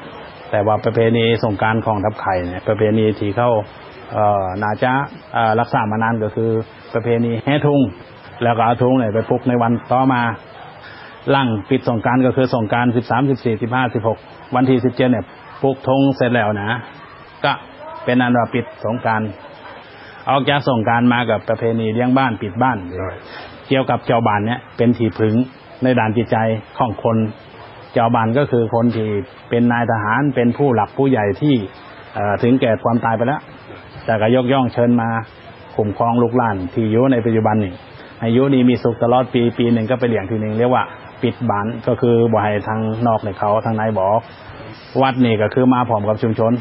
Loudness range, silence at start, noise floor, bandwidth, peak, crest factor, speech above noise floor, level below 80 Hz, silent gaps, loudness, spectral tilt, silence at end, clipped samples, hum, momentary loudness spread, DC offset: 2 LU; 0 s; -37 dBFS; 5.8 kHz; -2 dBFS; 16 dB; 21 dB; -48 dBFS; none; -17 LUFS; -11 dB/octave; 0 s; under 0.1%; none; 12 LU; under 0.1%